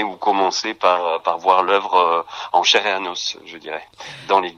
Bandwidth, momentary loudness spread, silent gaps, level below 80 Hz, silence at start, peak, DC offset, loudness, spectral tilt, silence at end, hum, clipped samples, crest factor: 10.5 kHz; 16 LU; none; -68 dBFS; 0 s; 0 dBFS; under 0.1%; -18 LUFS; -1.5 dB/octave; 0.05 s; none; under 0.1%; 20 dB